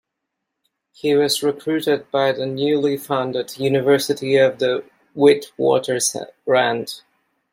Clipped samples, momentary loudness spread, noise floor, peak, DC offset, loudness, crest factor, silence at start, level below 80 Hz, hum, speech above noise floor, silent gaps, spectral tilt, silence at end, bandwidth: under 0.1%; 10 LU; -79 dBFS; -2 dBFS; under 0.1%; -19 LUFS; 18 dB; 1.05 s; -66 dBFS; none; 61 dB; none; -4 dB/octave; 0.55 s; 16.5 kHz